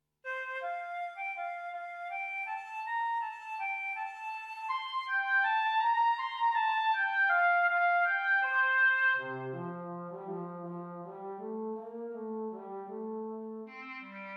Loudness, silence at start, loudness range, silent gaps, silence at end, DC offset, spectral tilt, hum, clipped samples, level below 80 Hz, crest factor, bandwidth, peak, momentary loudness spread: -32 LUFS; 0.25 s; 13 LU; none; 0 s; under 0.1%; -5.5 dB/octave; none; under 0.1%; -90 dBFS; 14 dB; 10 kHz; -18 dBFS; 16 LU